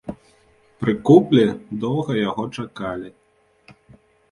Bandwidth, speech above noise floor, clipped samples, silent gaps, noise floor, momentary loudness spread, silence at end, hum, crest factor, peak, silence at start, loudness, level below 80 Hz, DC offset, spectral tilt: 11 kHz; 38 dB; under 0.1%; none; -56 dBFS; 17 LU; 1.25 s; none; 20 dB; 0 dBFS; 0.05 s; -20 LUFS; -56 dBFS; under 0.1%; -8 dB/octave